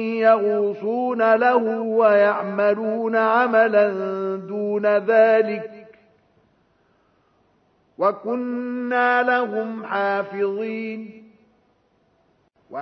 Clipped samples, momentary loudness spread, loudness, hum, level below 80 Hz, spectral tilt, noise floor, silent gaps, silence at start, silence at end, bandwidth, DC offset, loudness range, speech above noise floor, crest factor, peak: under 0.1%; 11 LU; -20 LUFS; none; -76 dBFS; -8 dB/octave; -63 dBFS; none; 0 s; 0 s; 5.8 kHz; under 0.1%; 9 LU; 44 dB; 18 dB; -4 dBFS